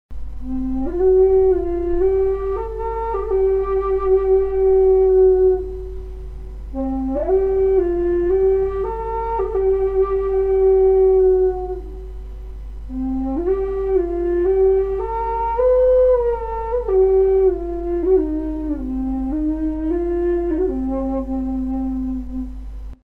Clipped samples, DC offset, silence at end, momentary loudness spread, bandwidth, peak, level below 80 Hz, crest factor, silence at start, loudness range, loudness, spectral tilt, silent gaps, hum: under 0.1%; under 0.1%; 0.1 s; 16 LU; 3.2 kHz; -6 dBFS; -30 dBFS; 12 dB; 0.1 s; 5 LU; -18 LUFS; -10.5 dB/octave; none; none